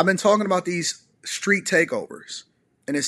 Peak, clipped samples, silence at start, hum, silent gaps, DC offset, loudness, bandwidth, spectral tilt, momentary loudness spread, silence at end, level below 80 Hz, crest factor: -4 dBFS; under 0.1%; 0 s; none; none; under 0.1%; -22 LUFS; 13 kHz; -3.5 dB/octave; 17 LU; 0 s; -72 dBFS; 20 dB